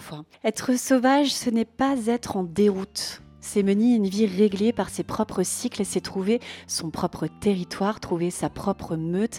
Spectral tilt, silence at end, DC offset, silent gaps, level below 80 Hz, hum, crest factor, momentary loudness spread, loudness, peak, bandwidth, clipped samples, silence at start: -5 dB/octave; 0 s; under 0.1%; none; -56 dBFS; none; 16 dB; 9 LU; -25 LUFS; -8 dBFS; 16.5 kHz; under 0.1%; 0 s